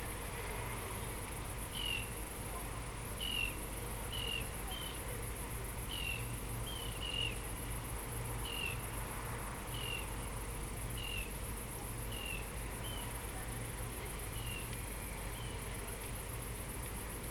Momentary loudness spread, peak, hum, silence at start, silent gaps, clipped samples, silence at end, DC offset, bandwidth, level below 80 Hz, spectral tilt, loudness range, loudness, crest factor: 5 LU; -26 dBFS; none; 0 s; none; under 0.1%; 0 s; under 0.1%; 19 kHz; -48 dBFS; -3 dB/octave; 3 LU; -42 LUFS; 16 dB